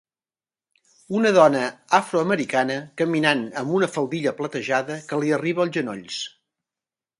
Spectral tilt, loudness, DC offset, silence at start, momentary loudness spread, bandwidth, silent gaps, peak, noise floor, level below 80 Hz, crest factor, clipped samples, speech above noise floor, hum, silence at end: -5 dB/octave; -22 LUFS; under 0.1%; 1.1 s; 11 LU; 11.5 kHz; none; -2 dBFS; under -90 dBFS; -72 dBFS; 22 dB; under 0.1%; over 68 dB; none; 0.9 s